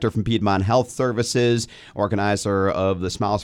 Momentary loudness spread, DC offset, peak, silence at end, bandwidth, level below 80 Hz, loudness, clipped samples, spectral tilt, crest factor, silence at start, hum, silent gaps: 5 LU; under 0.1%; -6 dBFS; 0 s; 14 kHz; -48 dBFS; -21 LUFS; under 0.1%; -5.5 dB/octave; 14 dB; 0 s; none; none